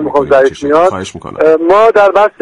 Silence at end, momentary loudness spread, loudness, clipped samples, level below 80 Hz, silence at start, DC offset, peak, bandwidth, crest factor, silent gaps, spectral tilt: 0.1 s; 6 LU; -9 LUFS; 0.3%; -42 dBFS; 0 s; under 0.1%; 0 dBFS; 11 kHz; 8 dB; none; -5.5 dB/octave